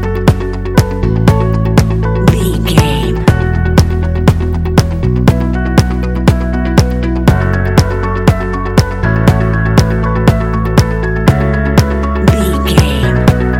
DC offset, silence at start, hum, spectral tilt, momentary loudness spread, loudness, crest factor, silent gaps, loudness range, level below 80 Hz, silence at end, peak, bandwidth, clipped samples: under 0.1%; 0 s; none; -6.5 dB/octave; 3 LU; -11 LUFS; 10 dB; none; 1 LU; -16 dBFS; 0 s; 0 dBFS; 17 kHz; 0.4%